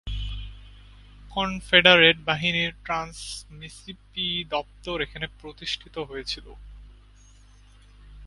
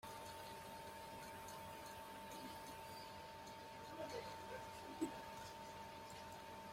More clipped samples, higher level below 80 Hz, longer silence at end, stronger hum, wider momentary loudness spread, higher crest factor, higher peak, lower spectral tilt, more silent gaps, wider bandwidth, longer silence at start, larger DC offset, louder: neither; first, -42 dBFS vs -74 dBFS; about the same, 0 s vs 0 s; first, 50 Hz at -50 dBFS vs none; first, 22 LU vs 6 LU; about the same, 26 dB vs 22 dB; first, 0 dBFS vs -32 dBFS; about the same, -3.5 dB/octave vs -4 dB/octave; neither; second, 11.5 kHz vs 16.5 kHz; about the same, 0.05 s vs 0 s; neither; first, -23 LUFS vs -53 LUFS